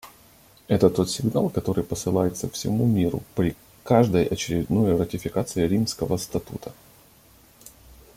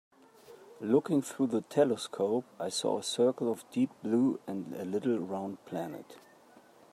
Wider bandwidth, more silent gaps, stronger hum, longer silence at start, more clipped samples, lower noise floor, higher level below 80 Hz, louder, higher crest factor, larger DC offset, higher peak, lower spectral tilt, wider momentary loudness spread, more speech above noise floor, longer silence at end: first, 16.5 kHz vs 14.5 kHz; neither; neither; second, 0.05 s vs 0.5 s; neither; second, -54 dBFS vs -59 dBFS; first, -50 dBFS vs -82 dBFS; first, -24 LUFS vs -32 LUFS; about the same, 20 dB vs 18 dB; neither; first, -4 dBFS vs -14 dBFS; about the same, -6 dB/octave vs -5.5 dB/octave; about the same, 9 LU vs 10 LU; about the same, 31 dB vs 28 dB; first, 1.45 s vs 0.75 s